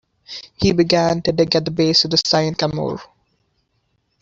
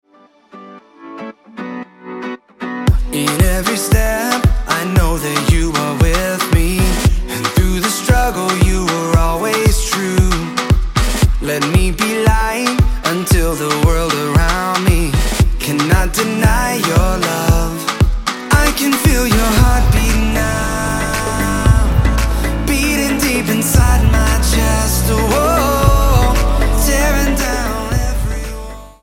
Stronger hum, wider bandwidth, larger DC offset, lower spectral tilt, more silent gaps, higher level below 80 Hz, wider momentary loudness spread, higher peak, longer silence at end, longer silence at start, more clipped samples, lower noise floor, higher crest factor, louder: neither; second, 7.8 kHz vs 17 kHz; neither; about the same, -5 dB/octave vs -5 dB/octave; neither; second, -48 dBFS vs -18 dBFS; first, 18 LU vs 6 LU; about the same, -2 dBFS vs 0 dBFS; first, 1.15 s vs 0.1 s; second, 0.3 s vs 0.55 s; neither; first, -67 dBFS vs -48 dBFS; about the same, 18 dB vs 14 dB; about the same, -17 LUFS vs -15 LUFS